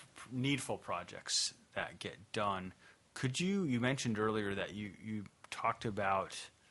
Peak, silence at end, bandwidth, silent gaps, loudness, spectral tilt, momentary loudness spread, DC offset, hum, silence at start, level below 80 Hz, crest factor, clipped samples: -18 dBFS; 0.2 s; 11.5 kHz; none; -38 LUFS; -4 dB/octave; 11 LU; under 0.1%; none; 0 s; -70 dBFS; 20 dB; under 0.1%